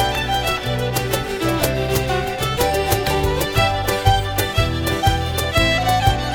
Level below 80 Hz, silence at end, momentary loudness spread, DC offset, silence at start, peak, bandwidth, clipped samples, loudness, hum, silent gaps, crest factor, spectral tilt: -28 dBFS; 0 s; 4 LU; under 0.1%; 0 s; -2 dBFS; over 20 kHz; under 0.1%; -19 LUFS; none; none; 18 dB; -4.5 dB/octave